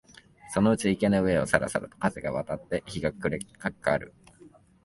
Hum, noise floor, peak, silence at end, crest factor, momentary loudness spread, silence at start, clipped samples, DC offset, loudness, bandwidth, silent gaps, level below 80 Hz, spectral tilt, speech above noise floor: none; -55 dBFS; -4 dBFS; 0.35 s; 24 dB; 9 LU; 0.45 s; under 0.1%; under 0.1%; -28 LUFS; 11.5 kHz; none; -52 dBFS; -6 dB/octave; 28 dB